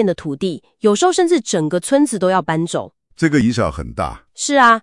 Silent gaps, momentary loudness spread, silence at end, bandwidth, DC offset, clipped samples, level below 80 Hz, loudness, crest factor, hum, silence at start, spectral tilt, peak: none; 10 LU; 0.05 s; 12 kHz; under 0.1%; under 0.1%; -42 dBFS; -17 LUFS; 16 dB; none; 0 s; -4.5 dB/octave; 0 dBFS